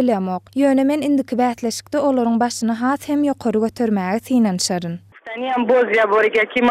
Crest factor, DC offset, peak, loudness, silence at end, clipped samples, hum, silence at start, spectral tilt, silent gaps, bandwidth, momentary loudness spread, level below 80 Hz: 14 dB; under 0.1%; -4 dBFS; -18 LUFS; 0 s; under 0.1%; none; 0 s; -5 dB/octave; none; 15.5 kHz; 8 LU; -60 dBFS